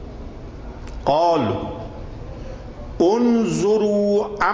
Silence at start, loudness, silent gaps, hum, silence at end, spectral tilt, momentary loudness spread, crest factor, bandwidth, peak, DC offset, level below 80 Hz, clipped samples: 0 s; -19 LUFS; none; none; 0 s; -6.5 dB/octave; 19 LU; 16 dB; 8 kHz; -6 dBFS; under 0.1%; -38 dBFS; under 0.1%